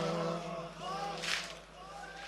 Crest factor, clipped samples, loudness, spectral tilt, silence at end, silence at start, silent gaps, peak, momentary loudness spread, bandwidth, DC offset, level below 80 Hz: 22 dB; under 0.1%; -38 LUFS; -3.5 dB/octave; 0 s; 0 s; none; -16 dBFS; 13 LU; 13 kHz; under 0.1%; -62 dBFS